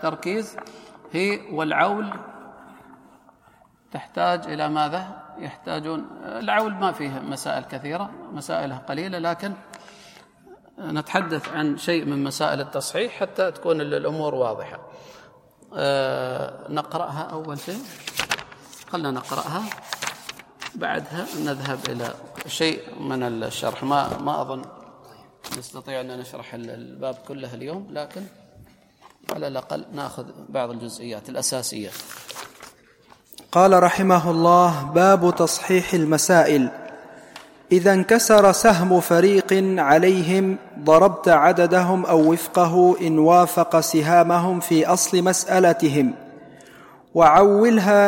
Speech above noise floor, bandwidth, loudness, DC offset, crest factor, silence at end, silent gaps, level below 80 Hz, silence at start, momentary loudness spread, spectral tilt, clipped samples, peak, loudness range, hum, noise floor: 36 dB; 16.5 kHz; -20 LUFS; under 0.1%; 20 dB; 0 s; none; -58 dBFS; 0 s; 20 LU; -4.5 dB/octave; under 0.1%; -2 dBFS; 15 LU; none; -56 dBFS